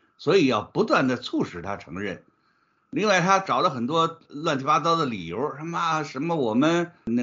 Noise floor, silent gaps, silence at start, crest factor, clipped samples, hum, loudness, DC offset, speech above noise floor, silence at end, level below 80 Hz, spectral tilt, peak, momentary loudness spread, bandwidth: -67 dBFS; none; 0.2 s; 20 dB; under 0.1%; none; -24 LUFS; under 0.1%; 43 dB; 0 s; -64 dBFS; -4 dB/octave; -4 dBFS; 12 LU; 7.4 kHz